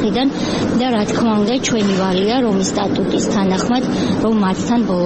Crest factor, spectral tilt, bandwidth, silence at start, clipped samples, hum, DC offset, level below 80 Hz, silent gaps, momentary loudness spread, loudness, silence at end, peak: 10 dB; -5.5 dB/octave; 8.8 kHz; 0 s; under 0.1%; none; 0.1%; -42 dBFS; none; 2 LU; -16 LUFS; 0 s; -6 dBFS